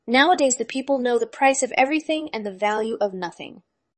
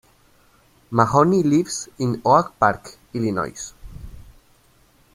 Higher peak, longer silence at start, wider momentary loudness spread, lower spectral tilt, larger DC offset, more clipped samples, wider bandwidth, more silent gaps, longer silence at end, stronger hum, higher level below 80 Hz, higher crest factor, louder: about the same, -4 dBFS vs -2 dBFS; second, 0.05 s vs 0.9 s; second, 14 LU vs 19 LU; second, -2.5 dB/octave vs -6 dB/octave; neither; neither; second, 8.8 kHz vs 16 kHz; neither; second, 0.45 s vs 0.95 s; neither; second, -70 dBFS vs -48 dBFS; about the same, 18 dB vs 20 dB; about the same, -21 LUFS vs -20 LUFS